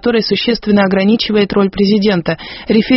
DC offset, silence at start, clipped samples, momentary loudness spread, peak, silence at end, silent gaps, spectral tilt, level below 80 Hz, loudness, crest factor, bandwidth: under 0.1%; 0.05 s; under 0.1%; 4 LU; 0 dBFS; 0 s; none; -4.5 dB/octave; -40 dBFS; -13 LUFS; 12 dB; 6 kHz